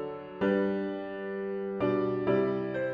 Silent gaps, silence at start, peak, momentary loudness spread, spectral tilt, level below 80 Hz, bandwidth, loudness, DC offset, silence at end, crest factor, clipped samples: none; 0 s; -16 dBFS; 8 LU; -9.5 dB/octave; -64 dBFS; 5.2 kHz; -31 LUFS; under 0.1%; 0 s; 16 dB; under 0.1%